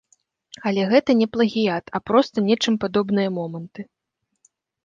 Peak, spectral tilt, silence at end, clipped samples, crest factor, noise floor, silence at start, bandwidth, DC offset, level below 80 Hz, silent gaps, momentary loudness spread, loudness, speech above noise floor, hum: -2 dBFS; -6 dB/octave; 1 s; under 0.1%; 20 dB; -78 dBFS; 0.65 s; 7.6 kHz; under 0.1%; -62 dBFS; none; 15 LU; -21 LUFS; 57 dB; none